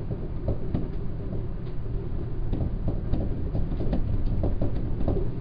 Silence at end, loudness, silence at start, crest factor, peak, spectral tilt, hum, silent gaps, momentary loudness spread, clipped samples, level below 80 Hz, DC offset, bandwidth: 0 s; -31 LUFS; 0 s; 14 dB; -12 dBFS; -11.5 dB/octave; none; none; 5 LU; under 0.1%; -30 dBFS; under 0.1%; 4.9 kHz